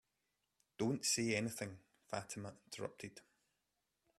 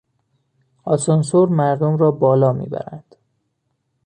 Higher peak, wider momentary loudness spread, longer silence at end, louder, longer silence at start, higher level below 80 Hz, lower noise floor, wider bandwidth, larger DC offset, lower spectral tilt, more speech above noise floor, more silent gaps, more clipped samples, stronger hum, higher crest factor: second, -24 dBFS vs -2 dBFS; about the same, 16 LU vs 14 LU; about the same, 1 s vs 1.05 s; second, -41 LUFS vs -17 LUFS; about the same, 0.8 s vs 0.85 s; second, -78 dBFS vs -60 dBFS; first, -87 dBFS vs -71 dBFS; first, 14.5 kHz vs 10.5 kHz; neither; second, -3.5 dB/octave vs -7.5 dB/octave; second, 45 dB vs 55 dB; neither; neither; neither; first, 22 dB vs 16 dB